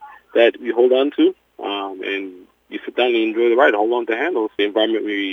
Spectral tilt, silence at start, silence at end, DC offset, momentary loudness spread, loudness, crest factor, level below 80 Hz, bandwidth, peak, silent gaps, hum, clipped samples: -5 dB/octave; 0 s; 0 s; under 0.1%; 12 LU; -18 LUFS; 18 dB; -70 dBFS; 5.6 kHz; -2 dBFS; none; none; under 0.1%